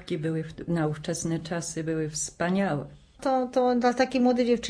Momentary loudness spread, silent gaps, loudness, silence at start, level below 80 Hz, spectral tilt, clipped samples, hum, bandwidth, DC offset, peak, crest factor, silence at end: 9 LU; none; -27 LUFS; 0 s; -56 dBFS; -5 dB/octave; under 0.1%; none; 11 kHz; under 0.1%; -12 dBFS; 16 dB; 0 s